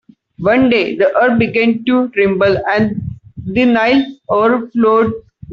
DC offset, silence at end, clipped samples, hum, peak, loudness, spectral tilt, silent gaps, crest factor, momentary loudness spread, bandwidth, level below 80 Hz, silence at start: under 0.1%; 0 s; under 0.1%; none; -2 dBFS; -13 LUFS; -8 dB/octave; none; 12 dB; 8 LU; 6.4 kHz; -46 dBFS; 0.4 s